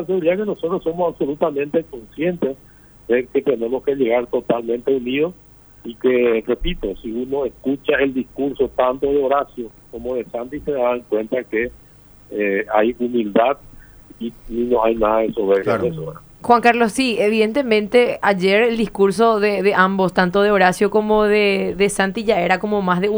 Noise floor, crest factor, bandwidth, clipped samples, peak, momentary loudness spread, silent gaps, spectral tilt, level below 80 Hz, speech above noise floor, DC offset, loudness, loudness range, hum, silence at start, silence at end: -46 dBFS; 18 dB; over 20 kHz; under 0.1%; 0 dBFS; 11 LU; none; -5.5 dB/octave; -42 dBFS; 28 dB; under 0.1%; -18 LUFS; 6 LU; none; 0 s; 0 s